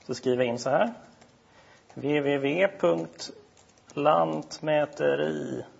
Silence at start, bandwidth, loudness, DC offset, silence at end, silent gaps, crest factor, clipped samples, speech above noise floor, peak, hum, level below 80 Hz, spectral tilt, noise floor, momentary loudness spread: 0.1 s; 8 kHz; -27 LUFS; under 0.1%; 0.1 s; none; 18 dB; under 0.1%; 30 dB; -8 dBFS; none; -72 dBFS; -5.5 dB/octave; -57 dBFS; 13 LU